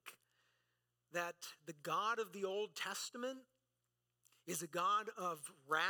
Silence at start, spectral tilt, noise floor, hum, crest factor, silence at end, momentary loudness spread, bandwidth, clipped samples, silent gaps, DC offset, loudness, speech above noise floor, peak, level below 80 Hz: 0.05 s; -2.5 dB/octave; -88 dBFS; 60 Hz at -85 dBFS; 20 dB; 0 s; 14 LU; 19 kHz; under 0.1%; none; under 0.1%; -42 LUFS; 46 dB; -22 dBFS; under -90 dBFS